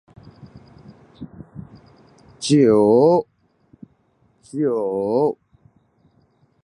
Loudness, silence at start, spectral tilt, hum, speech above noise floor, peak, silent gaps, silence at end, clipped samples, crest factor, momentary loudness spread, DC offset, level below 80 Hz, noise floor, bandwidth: -18 LUFS; 0.55 s; -6.5 dB/octave; none; 45 dB; -4 dBFS; none; 1.3 s; under 0.1%; 18 dB; 27 LU; under 0.1%; -58 dBFS; -61 dBFS; 11 kHz